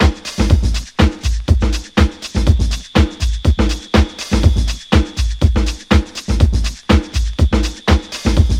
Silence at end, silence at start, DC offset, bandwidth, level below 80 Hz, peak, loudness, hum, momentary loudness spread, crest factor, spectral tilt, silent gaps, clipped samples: 0 s; 0 s; under 0.1%; 12.5 kHz; -16 dBFS; 0 dBFS; -16 LUFS; none; 4 LU; 14 dB; -6 dB/octave; none; under 0.1%